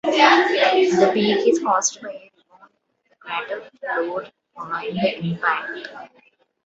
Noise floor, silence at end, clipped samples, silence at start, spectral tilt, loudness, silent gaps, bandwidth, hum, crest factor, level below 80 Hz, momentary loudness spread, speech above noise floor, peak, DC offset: -66 dBFS; 0.6 s; under 0.1%; 0.05 s; -3.5 dB/octave; -19 LUFS; none; 8.2 kHz; none; 20 dB; -66 dBFS; 21 LU; 45 dB; 0 dBFS; under 0.1%